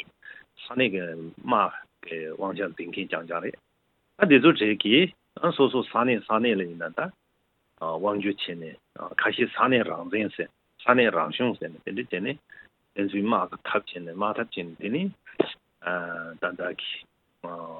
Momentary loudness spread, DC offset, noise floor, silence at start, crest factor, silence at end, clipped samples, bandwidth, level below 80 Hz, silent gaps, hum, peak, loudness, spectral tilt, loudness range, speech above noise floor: 17 LU; under 0.1%; -72 dBFS; 0.25 s; 24 dB; 0 s; under 0.1%; 4.4 kHz; -74 dBFS; none; none; -4 dBFS; -26 LUFS; -8.5 dB/octave; 8 LU; 46 dB